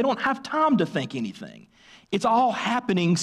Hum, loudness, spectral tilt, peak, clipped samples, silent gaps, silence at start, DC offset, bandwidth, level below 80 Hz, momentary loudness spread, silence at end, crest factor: none; -24 LUFS; -5.5 dB/octave; -12 dBFS; under 0.1%; none; 0 s; under 0.1%; 11.5 kHz; -66 dBFS; 12 LU; 0 s; 12 dB